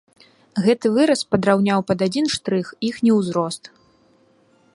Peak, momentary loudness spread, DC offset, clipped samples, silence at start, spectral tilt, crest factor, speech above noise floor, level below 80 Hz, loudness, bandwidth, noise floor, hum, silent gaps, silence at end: -2 dBFS; 8 LU; under 0.1%; under 0.1%; 0.55 s; -5.5 dB/octave; 20 dB; 38 dB; -58 dBFS; -20 LUFS; 11.5 kHz; -57 dBFS; none; none; 1.05 s